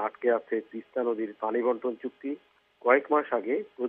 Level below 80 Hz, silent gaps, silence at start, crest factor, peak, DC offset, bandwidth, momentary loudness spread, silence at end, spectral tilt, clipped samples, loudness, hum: -86 dBFS; none; 0 s; 20 dB; -8 dBFS; under 0.1%; 3.9 kHz; 12 LU; 0 s; -8.5 dB/octave; under 0.1%; -29 LUFS; none